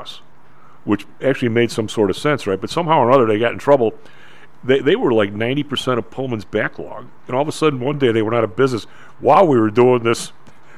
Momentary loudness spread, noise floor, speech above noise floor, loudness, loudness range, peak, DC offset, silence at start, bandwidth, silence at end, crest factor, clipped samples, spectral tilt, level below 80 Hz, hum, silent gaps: 12 LU; -49 dBFS; 33 dB; -17 LUFS; 4 LU; -2 dBFS; 2%; 0 s; 14 kHz; 0.5 s; 16 dB; under 0.1%; -6 dB/octave; -58 dBFS; none; none